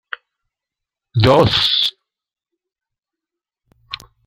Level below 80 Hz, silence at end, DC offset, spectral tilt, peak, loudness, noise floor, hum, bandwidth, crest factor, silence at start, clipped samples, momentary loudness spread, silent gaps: -46 dBFS; 0.3 s; under 0.1%; -5.5 dB/octave; 0 dBFS; -14 LUFS; -85 dBFS; none; 15.5 kHz; 20 dB; 1.15 s; under 0.1%; 21 LU; none